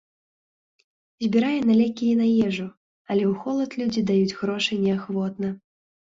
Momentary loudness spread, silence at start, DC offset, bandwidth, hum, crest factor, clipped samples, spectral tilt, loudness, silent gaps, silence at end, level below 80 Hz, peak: 10 LU; 1.2 s; under 0.1%; 7.6 kHz; none; 16 dB; under 0.1%; -6.5 dB/octave; -23 LUFS; 2.77-3.05 s; 0.55 s; -62 dBFS; -8 dBFS